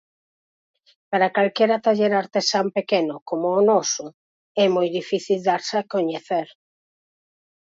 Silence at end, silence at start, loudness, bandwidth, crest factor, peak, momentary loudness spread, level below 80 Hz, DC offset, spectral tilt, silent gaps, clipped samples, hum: 1.3 s; 1.1 s; -21 LUFS; 7.8 kHz; 16 dB; -6 dBFS; 8 LU; -74 dBFS; under 0.1%; -4 dB/octave; 3.22-3.26 s, 4.14-4.55 s; under 0.1%; none